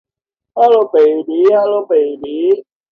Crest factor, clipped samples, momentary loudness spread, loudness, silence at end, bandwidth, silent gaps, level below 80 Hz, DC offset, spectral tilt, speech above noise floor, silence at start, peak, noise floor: 12 dB; under 0.1%; 8 LU; -13 LUFS; 0.3 s; 5.4 kHz; none; -66 dBFS; under 0.1%; -6.5 dB/octave; 72 dB; 0.55 s; 0 dBFS; -84 dBFS